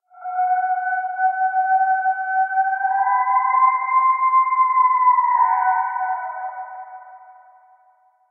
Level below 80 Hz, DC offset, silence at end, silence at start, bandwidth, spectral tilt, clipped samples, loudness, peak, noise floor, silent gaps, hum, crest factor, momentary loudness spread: under -90 dBFS; under 0.1%; 1 s; 0.15 s; 2.4 kHz; 7 dB/octave; under 0.1%; -18 LUFS; -6 dBFS; -58 dBFS; none; none; 14 dB; 13 LU